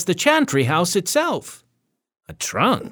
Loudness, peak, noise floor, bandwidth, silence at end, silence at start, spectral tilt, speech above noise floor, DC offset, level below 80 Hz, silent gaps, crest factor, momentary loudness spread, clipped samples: -19 LUFS; -2 dBFS; -73 dBFS; over 20 kHz; 0.05 s; 0 s; -4 dB/octave; 53 dB; under 0.1%; -58 dBFS; none; 18 dB; 12 LU; under 0.1%